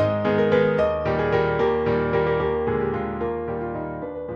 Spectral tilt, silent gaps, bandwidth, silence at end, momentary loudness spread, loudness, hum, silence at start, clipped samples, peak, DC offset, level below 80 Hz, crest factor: -8.5 dB/octave; none; 6.6 kHz; 0 s; 9 LU; -23 LUFS; none; 0 s; under 0.1%; -6 dBFS; under 0.1%; -42 dBFS; 16 dB